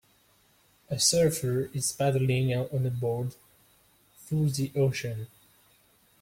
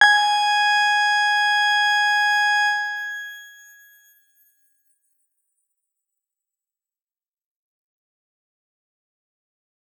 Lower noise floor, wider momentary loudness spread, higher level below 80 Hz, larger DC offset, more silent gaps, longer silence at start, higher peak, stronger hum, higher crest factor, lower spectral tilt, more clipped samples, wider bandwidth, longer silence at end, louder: second, -64 dBFS vs under -90 dBFS; about the same, 13 LU vs 12 LU; first, -60 dBFS vs under -90 dBFS; neither; neither; first, 0.9 s vs 0 s; second, -8 dBFS vs -2 dBFS; neither; about the same, 22 dB vs 22 dB; first, -4.5 dB/octave vs 5 dB/octave; neither; second, 16.5 kHz vs 18.5 kHz; second, 0.95 s vs 6.5 s; second, -28 LUFS vs -18 LUFS